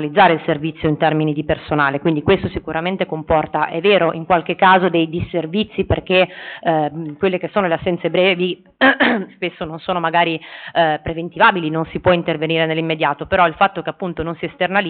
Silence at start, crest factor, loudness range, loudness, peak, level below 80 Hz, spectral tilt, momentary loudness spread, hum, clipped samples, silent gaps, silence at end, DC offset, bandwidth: 0 s; 16 dB; 2 LU; -17 LUFS; -2 dBFS; -44 dBFS; -3.5 dB/octave; 9 LU; none; under 0.1%; none; 0 s; under 0.1%; 4.6 kHz